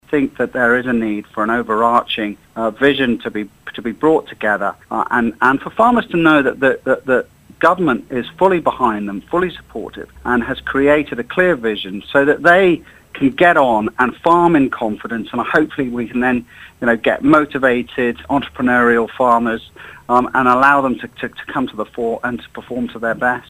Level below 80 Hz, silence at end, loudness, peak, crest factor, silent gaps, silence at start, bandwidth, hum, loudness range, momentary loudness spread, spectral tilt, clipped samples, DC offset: -46 dBFS; 0.1 s; -16 LUFS; 0 dBFS; 16 dB; none; 0.1 s; 15.5 kHz; none; 4 LU; 12 LU; -6.5 dB/octave; under 0.1%; under 0.1%